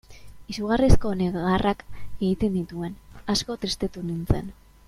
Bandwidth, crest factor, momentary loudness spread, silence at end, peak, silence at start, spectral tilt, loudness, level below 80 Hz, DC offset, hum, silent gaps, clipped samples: 14 kHz; 22 dB; 14 LU; 0.35 s; -4 dBFS; 0.1 s; -6 dB/octave; -26 LUFS; -32 dBFS; under 0.1%; none; none; under 0.1%